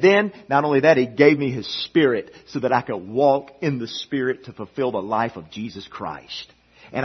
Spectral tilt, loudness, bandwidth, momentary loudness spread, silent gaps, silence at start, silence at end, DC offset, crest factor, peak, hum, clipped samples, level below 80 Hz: -6.5 dB/octave; -21 LUFS; 6.4 kHz; 16 LU; none; 0 s; 0 s; under 0.1%; 20 dB; 0 dBFS; none; under 0.1%; -62 dBFS